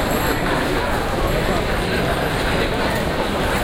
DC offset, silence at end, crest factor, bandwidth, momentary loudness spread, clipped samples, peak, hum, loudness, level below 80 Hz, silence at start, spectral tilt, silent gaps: under 0.1%; 0 s; 16 dB; 17 kHz; 1 LU; under 0.1%; -4 dBFS; none; -20 LUFS; -28 dBFS; 0 s; -5 dB/octave; none